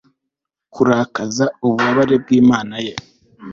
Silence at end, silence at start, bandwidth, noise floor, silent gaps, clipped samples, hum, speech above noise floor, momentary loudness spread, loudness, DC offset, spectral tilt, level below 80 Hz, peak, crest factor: 0 s; 0.75 s; 7.4 kHz; -80 dBFS; none; under 0.1%; none; 65 dB; 13 LU; -16 LUFS; under 0.1%; -5.5 dB/octave; -54 dBFS; -2 dBFS; 14 dB